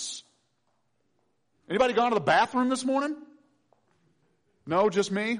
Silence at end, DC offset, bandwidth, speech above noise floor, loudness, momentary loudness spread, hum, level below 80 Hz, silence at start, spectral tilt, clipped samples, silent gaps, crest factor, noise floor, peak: 0 s; under 0.1%; 10.5 kHz; 50 dB; -26 LUFS; 12 LU; none; -66 dBFS; 0 s; -4 dB/octave; under 0.1%; none; 16 dB; -75 dBFS; -12 dBFS